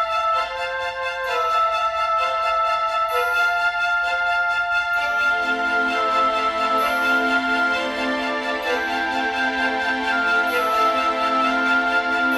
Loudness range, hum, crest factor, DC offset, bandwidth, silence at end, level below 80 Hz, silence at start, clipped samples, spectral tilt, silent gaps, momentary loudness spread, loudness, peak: 1 LU; none; 12 dB; under 0.1%; 15.5 kHz; 0 s; -52 dBFS; 0 s; under 0.1%; -2.5 dB/octave; none; 4 LU; -20 LUFS; -8 dBFS